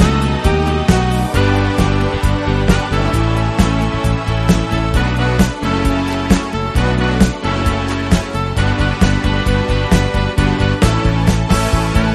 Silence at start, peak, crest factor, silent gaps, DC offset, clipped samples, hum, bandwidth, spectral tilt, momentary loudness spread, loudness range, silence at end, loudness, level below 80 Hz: 0 s; 0 dBFS; 14 dB; none; under 0.1%; under 0.1%; none; 13.5 kHz; -6 dB/octave; 3 LU; 1 LU; 0 s; -15 LUFS; -20 dBFS